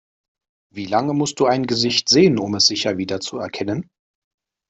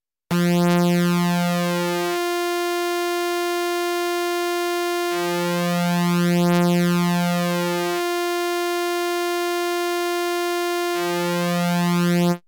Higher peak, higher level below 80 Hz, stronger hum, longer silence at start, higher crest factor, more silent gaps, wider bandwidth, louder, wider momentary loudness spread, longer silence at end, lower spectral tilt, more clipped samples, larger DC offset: first, -2 dBFS vs -10 dBFS; first, -58 dBFS vs -70 dBFS; neither; first, 0.75 s vs 0.3 s; first, 18 dB vs 10 dB; neither; second, 8.4 kHz vs 17.5 kHz; first, -18 LUFS vs -21 LUFS; first, 13 LU vs 4 LU; first, 0.85 s vs 0.1 s; second, -4 dB/octave vs -5.5 dB/octave; neither; neither